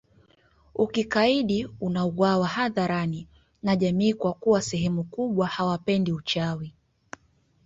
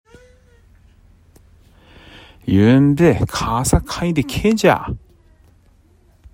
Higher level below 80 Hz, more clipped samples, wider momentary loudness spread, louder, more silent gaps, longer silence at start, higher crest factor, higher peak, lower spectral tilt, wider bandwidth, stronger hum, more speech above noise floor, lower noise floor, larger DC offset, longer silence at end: second, -56 dBFS vs -34 dBFS; neither; first, 14 LU vs 11 LU; second, -25 LUFS vs -16 LUFS; neither; second, 0.75 s vs 2.45 s; about the same, 18 dB vs 18 dB; second, -8 dBFS vs 0 dBFS; about the same, -6 dB/octave vs -6 dB/octave; second, 7.8 kHz vs 16 kHz; neither; about the same, 39 dB vs 37 dB; first, -64 dBFS vs -52 dBFS; neither; second, 0.95 s vs 1.35 s